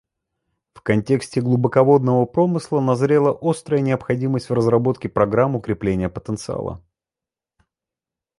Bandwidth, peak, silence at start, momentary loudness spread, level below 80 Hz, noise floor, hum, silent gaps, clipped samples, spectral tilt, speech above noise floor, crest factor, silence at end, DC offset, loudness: 11.5 kHz; -2 dBFS; 0.75 s; 11 LU; -48 dBFS; -89 dBFS; none; none; under 0.1%; -8 dB/octave; 70 dB; 18 dB; 1.6 s; under 0.1%; -19 LUFS